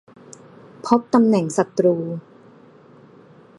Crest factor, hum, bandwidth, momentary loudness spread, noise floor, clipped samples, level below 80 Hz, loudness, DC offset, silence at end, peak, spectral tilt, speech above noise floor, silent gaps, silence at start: 22 dB; none; 11.5 kHz; 16 LU; -48 dBFS; under 0.1%; -66 dBFS; -19 LUFS; under 0.1%; 1.4 s; 0 dBFS; -7 dB/octave; 30 dB; none; 0.85 s